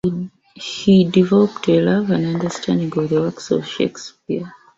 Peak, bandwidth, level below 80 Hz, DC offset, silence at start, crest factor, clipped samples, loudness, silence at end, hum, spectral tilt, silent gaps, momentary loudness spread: -2 dBFS; 7.8 kHz; -54 dBFS; under 0.1%; 0.05 s; 16 dB; under 0.1%; -18 LUFS; 0.25 s; none; -6.5 dB/octave; none; 14 LU